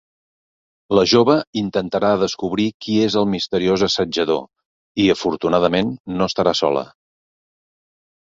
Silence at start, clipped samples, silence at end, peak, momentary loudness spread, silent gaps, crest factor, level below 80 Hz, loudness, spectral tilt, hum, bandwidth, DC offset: 0.9 s; under 0.1%; 1.4 s; -2 dBFS; 8 LU; 1.47-1.53 s, 2.74-2.80 s, 4.65-4.95 s, 6.00-6.04 s; 18 dB; -52 dBFS; -18 LUFS; -5 dB/octave; none; 7.8 kHz; under 0.1%